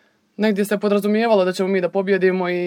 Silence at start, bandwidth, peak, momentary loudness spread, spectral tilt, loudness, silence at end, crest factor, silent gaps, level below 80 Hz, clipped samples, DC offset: 0.4 s; 17.5 kHz; -4 dBFS; 3 LU; -6.5 dB/octave; -19 LUFS; 0 s; 14 dB; none; -74 dBFS; under 0.1%; under 0.1%